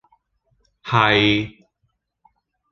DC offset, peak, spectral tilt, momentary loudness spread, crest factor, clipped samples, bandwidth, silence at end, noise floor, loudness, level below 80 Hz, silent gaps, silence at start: under 0.1%; -2 dBFS; -6 dB/octave; 19 LU; 22 dB; under 0.1%; 7.2 kHz; 1.2 s; -71 dBFS; -17 LUFS; -52 dBFS; none; 0.85 s